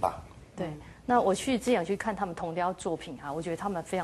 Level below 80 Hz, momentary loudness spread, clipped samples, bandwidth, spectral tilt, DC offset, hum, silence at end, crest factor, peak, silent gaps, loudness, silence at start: -56 dBFS; 12 LU; under 0.1%; 12.5 kHz; -5 dB/octave; under 0.1%; none; 0 s; 20 dB; -12 dBFS; none; -31 LUFS; 0 s